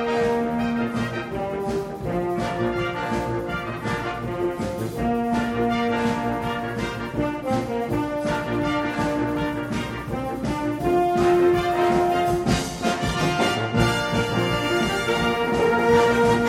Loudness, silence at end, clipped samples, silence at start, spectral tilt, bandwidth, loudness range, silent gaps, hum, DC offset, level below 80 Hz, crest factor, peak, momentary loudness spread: -23 LUFS; 0 s; under 0.1%; 0 s; -5.5 dB/octave; 16 kHz; 5 LU; none; none; under 0.1%; -42 dBFS; 18 dB; -4 dBFS; 8 LU